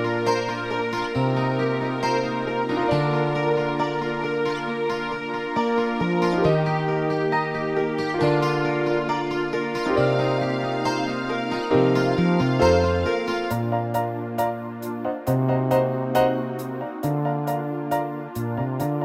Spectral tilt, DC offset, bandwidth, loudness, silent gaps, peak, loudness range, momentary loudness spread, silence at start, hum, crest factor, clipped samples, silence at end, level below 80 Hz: -7 dB/octave; under 0.1%; 16 kHz; -23 LUFS; none; -6 dBFS; 3 LU; 7 LU; 0 s; none; 16 dB; under 0.1%; 0 s; -48 dBFS